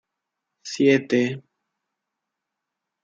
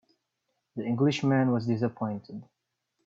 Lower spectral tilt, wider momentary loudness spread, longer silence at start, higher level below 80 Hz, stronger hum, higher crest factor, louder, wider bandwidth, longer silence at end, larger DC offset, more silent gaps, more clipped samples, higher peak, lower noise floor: second, -5.5 dB/octave vs -7.5 dB/octave; about the same, 19 LU vs 18 LU; about the same, 0.65 s vs 0.75 s; about the same, -74 dBFS vs -70 dBFS; neither; about the same, 20 dB vs 16 dB; first, -21 LUFS vs -28 LUFS; about the same, 7.8 kHz vs 7.8 kHz; first, 1.65 s vs 0.65 s; neither; neither; neither; first, -6 dBFS vs -14 dBFS; about the same, -83 dBFS vs -80 dBFS